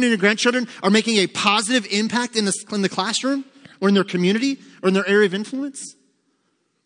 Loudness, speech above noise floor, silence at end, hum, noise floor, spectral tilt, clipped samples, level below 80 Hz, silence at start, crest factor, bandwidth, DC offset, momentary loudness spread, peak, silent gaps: -20 LUFS; 49 dB; 0.95 s; none; -69 dBFS; -4 dB/octave; under 0.1%; -72 dBFS; 0 s; 18 dB; 10.5 kHz; under 0.1%; 10 LU; -2 dBFS; none